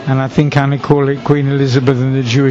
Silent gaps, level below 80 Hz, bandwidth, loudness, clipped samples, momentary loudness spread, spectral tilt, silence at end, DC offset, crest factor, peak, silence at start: none; -44 dBFS; 7.6 kHz; -13 LUFS; under 0.1%; 2 LU; -7.5 dB/octave; 0 s; under 0.1%; 12 dB; 0 dBFS; 0 s